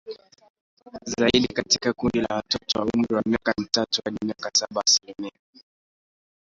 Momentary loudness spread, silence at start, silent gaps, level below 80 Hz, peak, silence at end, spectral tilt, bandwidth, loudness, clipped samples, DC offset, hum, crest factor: 17 LU; 0.05 s; 0.50-0.55 s, 0.61-0.77 s; -54 dBFS; -4 dBFS; 1.2 s; -2.5 dB/octave; 7.8 kHz; -23 LUFS; under 0.1%; under 0.1%; none; 22 dB